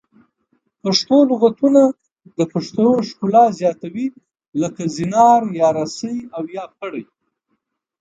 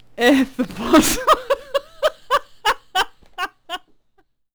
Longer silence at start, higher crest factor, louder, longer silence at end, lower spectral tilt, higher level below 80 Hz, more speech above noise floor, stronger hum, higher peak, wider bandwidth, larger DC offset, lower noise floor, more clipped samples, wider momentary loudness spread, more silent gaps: first, 0.85 s vs 0.2 s; about the same, 18 dB vs 16 dB; about the same, -17 LUFS vs -19 LUFS; first, 0.95 s vs 0.8 s; first, -5.5 dB/octave vs -2.5 dB/octave; second, -64 dBFS vs -42 dBFS; first, 55 dB vs 45 dB; neither; first, 0 dBFS vs -4 dBFS; second, 9 kHz vs over 20 kHz; second, under 0.1% vs 0.2%; first, -72 dBFS vs -61 dBFS; neither; about the same, 16 LU vs 14 LU; first, 4.48-4.52 s vs none